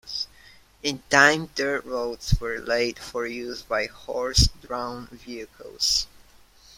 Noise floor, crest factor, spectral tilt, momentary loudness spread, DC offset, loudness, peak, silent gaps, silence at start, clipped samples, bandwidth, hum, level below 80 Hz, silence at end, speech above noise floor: -53 dBFS; 26 dB; -3 dB/octave; 19 LU; under 0.1%; -24 LUFS; 0 dBFS; none; 0.05 s; under 0.1%; 16.5 kHz; none; -36 dBFS; 0.7 s; 28 dB